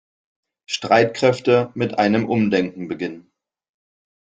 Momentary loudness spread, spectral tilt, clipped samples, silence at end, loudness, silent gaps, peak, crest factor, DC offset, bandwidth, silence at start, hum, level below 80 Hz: 11 LU; -5.5 dB/octave; under 0.1%; 1.15 s; -19 LUFS; none; -2 dBFS; 18 dB; under 0.1%; 9.2 kHz; 0.7 s; none; -60 dBFS